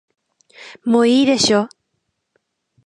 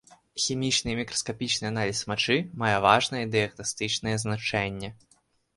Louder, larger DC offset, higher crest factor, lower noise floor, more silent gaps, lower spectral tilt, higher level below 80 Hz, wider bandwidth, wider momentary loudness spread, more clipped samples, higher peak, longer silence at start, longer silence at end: first, -15 LUFS vs -26 LUFS; neither; second, 18 dB vs 24 dB; first, -73 dBFS vs -66 dBFS; neither; about the same, -3.5 dB/octave vs -3.5 dB/octave; second, -62 dBFS vs -56 dBFS; about the same, 11 kHz vs 11.5 kHz; first, 13 LU vs 8 LU; neither; about the same, -2 dBFS vs -4 dBFS; first, 0.6 s vs 0.35 s; first, 1.2 s vs 0.65 s